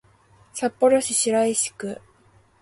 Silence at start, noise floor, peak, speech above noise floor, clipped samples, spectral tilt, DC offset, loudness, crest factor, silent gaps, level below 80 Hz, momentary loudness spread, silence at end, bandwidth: 0.55 s; -57 dBFS; -6 dBFS; 36 dB; under 0.1%; -2.5 dB/octave; under 0.1%; -21 LUFS; 18 dB; none; -64 dBFS; 16 LU; 0.65 s; 12 kHz